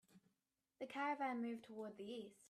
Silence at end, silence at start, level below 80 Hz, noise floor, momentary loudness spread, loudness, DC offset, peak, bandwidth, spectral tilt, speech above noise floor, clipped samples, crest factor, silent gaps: 0 s; 0.15 s; under -90 dBFS; -90 dBFS; 10 LU; -47 LUFS; under 0.1%; -32 dBFS; 13.5 kHz; -5 dB/octave; 43 dB; under 0.1%; 16 dB; none